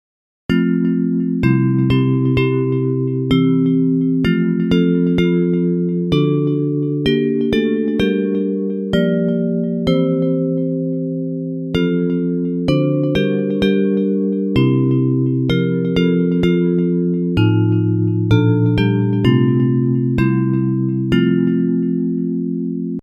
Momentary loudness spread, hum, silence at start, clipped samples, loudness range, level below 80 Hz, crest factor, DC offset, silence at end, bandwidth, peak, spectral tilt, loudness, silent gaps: 5 LU; none; 0.5 s; under 0.1%; 3 LU; -42 dBFS; 14 dB; under 0.1%; 0 s; 6.4 kHz; 0 dBFS; -9 dB/octave; -17 LUFS; none